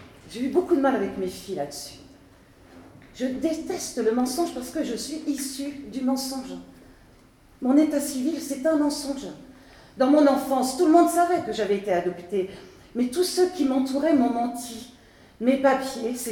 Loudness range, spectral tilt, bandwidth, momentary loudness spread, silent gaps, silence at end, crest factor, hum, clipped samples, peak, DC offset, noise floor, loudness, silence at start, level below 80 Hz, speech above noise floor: 7 LU; -4 dB/octave; 19 kHz; 14 LU; none; 0 s; 20 dB; none; under 0.1%; -6 dBFS; under 0.1%; -54 dBFS; -24 LUFS; 0 s; -58 dBFS; 30 dB